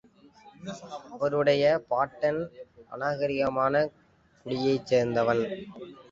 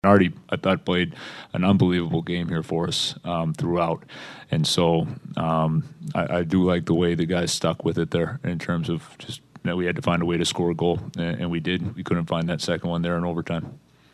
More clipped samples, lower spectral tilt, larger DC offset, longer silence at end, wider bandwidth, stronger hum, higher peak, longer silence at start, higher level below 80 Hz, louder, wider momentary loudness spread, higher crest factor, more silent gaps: neither; about the same, -6 dB/octave vs -5.5 dB/octave; neither; second, 0.1 s vs 0.35 s; second, 7.6 kHz vs 12.5 kHz; neither; second, -10 dBFS vs -4 dBFS; first, 0.45 s vs 0.05 s; second, -64 dBFS vs -52 dBFS; second, -27 LUFS vs -24 LUFS; first, 18 LU vs 9 LU; about the same, 18 dB vs 20 dB; neither